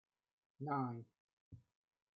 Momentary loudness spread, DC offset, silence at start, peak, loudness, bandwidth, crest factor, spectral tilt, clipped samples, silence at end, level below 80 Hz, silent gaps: 23 LU; under 0.1%; 0.6 s; -28 dBFS; -44 LUFS; 5 kHz; 20 dB; -9 dB/octave; under 0.1%; 0.6 s; -82 dBFS; 1.20-1.52 s